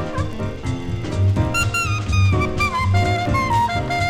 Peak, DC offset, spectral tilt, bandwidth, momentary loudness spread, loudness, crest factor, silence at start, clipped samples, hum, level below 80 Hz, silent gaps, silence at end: -6 dBFS; under 0.1%; -5.5 dB/octave; 14.5 kHz; 8 LU; -20 LUFS; 12 dB; 0 s; under 0.1%; none; -32 dBFS; none; 0 s